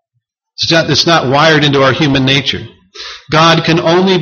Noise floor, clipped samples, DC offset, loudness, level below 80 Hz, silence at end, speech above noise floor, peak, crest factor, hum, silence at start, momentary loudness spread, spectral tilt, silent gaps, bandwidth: -68 dBFS; under 0.1%; under 0.1%; -9 LUFS; -42 dBFS; 0 s; 58 dB; 0 dBFS; 10 dB; none; 0.6 s; 13 LU; -4.5 dB/octave; none; 7.2 kHz